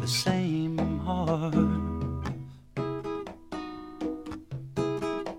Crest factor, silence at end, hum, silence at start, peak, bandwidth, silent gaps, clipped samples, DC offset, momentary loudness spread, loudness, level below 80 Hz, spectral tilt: 18 dB; 0 s; none; 0 s; -12 dBFS; 16.5 kHz; none; under 0.1%; under 0.1%; 13 LU; -31 LUFS; -46 dBFS; -6 dB/octave